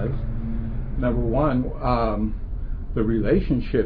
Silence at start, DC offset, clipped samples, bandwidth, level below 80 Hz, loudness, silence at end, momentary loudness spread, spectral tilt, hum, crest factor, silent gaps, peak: 0 s; under 0.1%; under 0.1%; 4.9 kHz; -28 dBFS; -25 LUFS; 0 s; 9 LU; -11.5 dB/octave; none; 14 dB; none; -8 dBFS